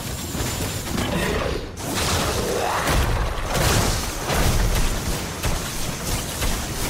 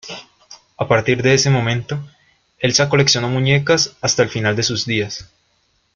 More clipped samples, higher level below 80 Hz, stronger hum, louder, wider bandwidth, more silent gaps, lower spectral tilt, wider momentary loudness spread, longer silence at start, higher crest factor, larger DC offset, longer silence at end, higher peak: neither; first, -28 dBFS vs -50 dBFS; neither; second, -23 LUFS vs -16 LUFS; first, 16.5 kHz vs 7.4 kHz; neither; about the same, -3.5 dB/octave vs -4 dB/octave; second, 6 LU vs 13 LU; about the same, 0 s vs 0.05 s; about the same, 16 dB vs 18 dB; neither; second, 0 s vs 0.7 s; second, -6 dBFS vs -2 dBFS